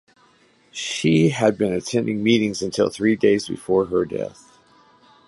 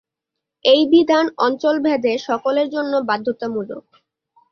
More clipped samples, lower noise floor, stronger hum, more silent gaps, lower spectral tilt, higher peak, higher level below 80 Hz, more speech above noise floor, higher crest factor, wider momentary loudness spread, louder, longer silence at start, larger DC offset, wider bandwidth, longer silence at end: neither; second, -57 dBFS vs -82 dBFS; neither; neither; about the same, -5.5 dB/octave vs -5 dB/octave; about the same, -4 dBFS vs -2 dBFS; first, -56 dBFS vs -66 dBFS; second, 37 dB vs 65 dB; about the same, 18 dB vs 16 dB; about the same, 10 LU vs 12 LU; second, -21 LUFS vs -18 LUFS; about the same, 0.75 s vs 0.65 s; neither; first, 11.5 kHz vs 6.8 kHz; first, 0.95 s vs 0.7 s